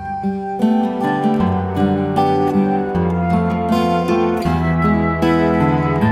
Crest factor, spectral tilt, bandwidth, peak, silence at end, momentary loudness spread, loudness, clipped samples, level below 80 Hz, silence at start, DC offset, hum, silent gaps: 14 dB; -8 dB/octave; 13 kHz; -2 dBFS; 0 s; 3 LU; -17 LUFS; under 0.1%; -36 dBFS; 0 s; under 0.1%; none; none